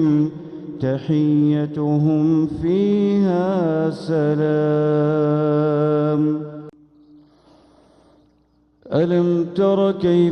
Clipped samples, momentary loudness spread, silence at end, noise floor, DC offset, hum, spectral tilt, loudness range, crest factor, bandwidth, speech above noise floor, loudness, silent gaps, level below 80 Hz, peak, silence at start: under 0.1%; 7 LU; 0 s; -59 dBFS; under 0.1%; none; -9.5 dB/octave; 7 LU; 12 dB; 6.4 kHz; 41 dB; -19 LUFS; none; -54 dBFS; -6 dBFS; 0 s